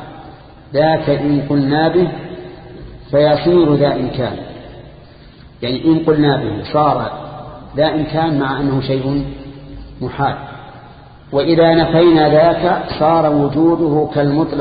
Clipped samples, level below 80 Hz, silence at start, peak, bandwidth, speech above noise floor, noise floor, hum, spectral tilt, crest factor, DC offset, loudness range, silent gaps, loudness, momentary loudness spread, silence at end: under 0.1%; -40 dBFS; 0 s; 0 dBFS; 5 kHz; 26 dB; -40 dBFS; none; -12.5 dB/octave; 16 dB; under 0.1%; 6 LU; none; -14 LUFS; 21 LU; 0 s